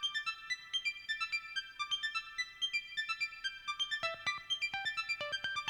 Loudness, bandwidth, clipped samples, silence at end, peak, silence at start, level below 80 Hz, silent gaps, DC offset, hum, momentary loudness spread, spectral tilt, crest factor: -37 LUFS; over 20 kHz; under 0.1%; 0 s; -22 dBFS; 0 s; -72 dBFS; none; under 0.1%; none; 4 LU; 1 dB/octave; 18 dB